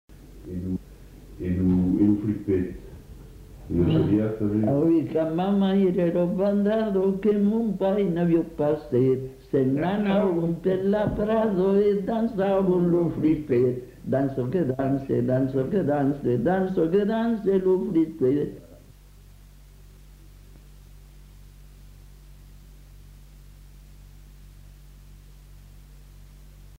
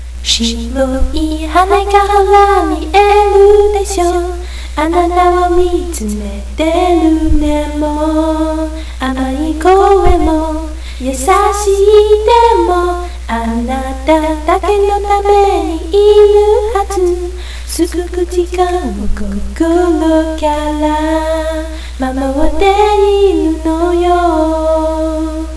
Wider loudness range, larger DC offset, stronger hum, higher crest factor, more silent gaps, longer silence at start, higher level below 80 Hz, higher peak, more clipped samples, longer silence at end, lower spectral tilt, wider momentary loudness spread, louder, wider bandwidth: about the same, 4 LU vs 4 LU; second, under 0.1% vs 2%; neither; about the same, 14 dB vs 10 dB; neither; first, 0.2 s vs 0 s; second, -48 dBFS vs -20 dBFS; second, -10 dBFS vs 0 dBFS; second, under 0.1% vs 0.5%; about the same, 0.05 s vs 0 s; first, -9.5 dB/octave vs -5.5 dB/octave; second, 7 LU vs 12 LU; second, -24 LUFS vs -11 LUFS; first, 15.5 kHz vs 11 kHz